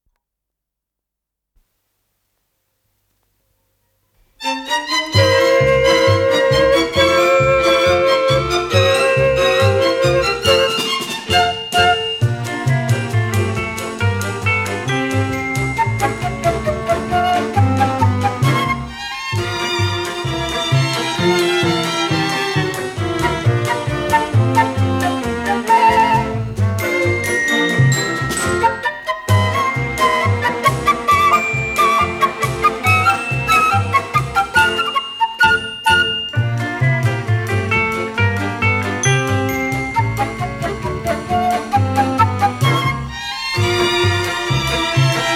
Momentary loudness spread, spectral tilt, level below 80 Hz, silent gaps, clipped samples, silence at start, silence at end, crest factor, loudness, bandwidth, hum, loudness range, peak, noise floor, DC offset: 7 LU; -4.5 dB/octave; -40 dBFS; none; under 0.1%; 4.4 s; 0 s; 16 dB; -16 LUFS; 16.5 kHz; none; 5 LU; 0 dBFS; -82 dBFS; under 0.1%